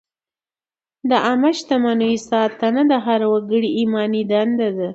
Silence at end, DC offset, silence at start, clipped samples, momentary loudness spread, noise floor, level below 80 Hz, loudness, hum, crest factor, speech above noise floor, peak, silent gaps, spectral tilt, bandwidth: 0 s; under 0.1%; 1.05 s; under 0.1%; 3 LU; under -90 dBFS; -64 dBFS; -18 LUFS; none; 16 dB; over 73 dB; -2 dBFS; none; -5.5 dB/octave; 8 kHz